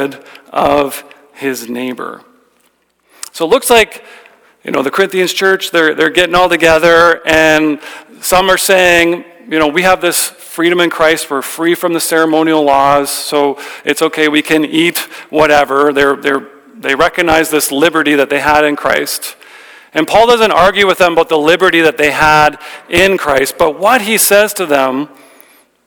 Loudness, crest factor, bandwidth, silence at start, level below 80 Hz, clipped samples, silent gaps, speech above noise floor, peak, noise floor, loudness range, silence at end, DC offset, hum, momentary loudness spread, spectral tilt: -10 LUFS; 12 dB; over 20 kHz; 0 s; -40 dBFS; 0.3%; none; 46 dB; 0 dBFS; -56 dBFS; 5 LU; 0.8 s; under 0.1%; none; 12 LU; -3 dB/octave